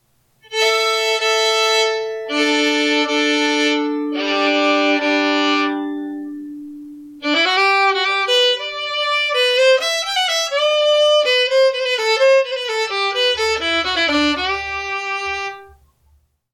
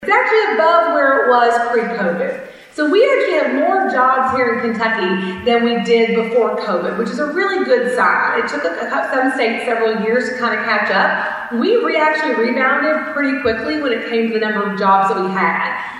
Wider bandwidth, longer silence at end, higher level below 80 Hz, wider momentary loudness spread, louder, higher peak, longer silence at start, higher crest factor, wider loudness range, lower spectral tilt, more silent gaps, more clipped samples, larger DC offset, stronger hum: first, 15.5 kHz vs 11.5 kHz; first, 0.85 s vs 0 s; about the same, -54 dBFS vs -56 dBFS; first, 10 LU vs 6 LU; about the same, -16 LUFS vs -15 LUFS; second, -6 dBFS vs -2 dBFS; first, 0.5 s vs 0 s; about the same, 12 dB vs 14 dB; about the same, 3 LU vs 2 LU; second, -1 dB/octave vs -5.5 dB/octave; neither; neither; neither; neither